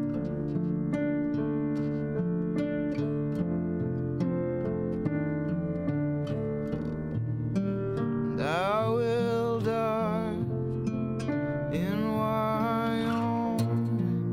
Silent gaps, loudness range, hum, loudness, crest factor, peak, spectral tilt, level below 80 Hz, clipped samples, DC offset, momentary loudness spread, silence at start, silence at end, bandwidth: none; 2 LU; none; -30 LUFS; 12 dB; -18 dBFS; -8.5 dB/octave; -54 dBFS; under 0.1%; under 0.1%; 4 LU; 0 s; 0 s; 15.5 kHz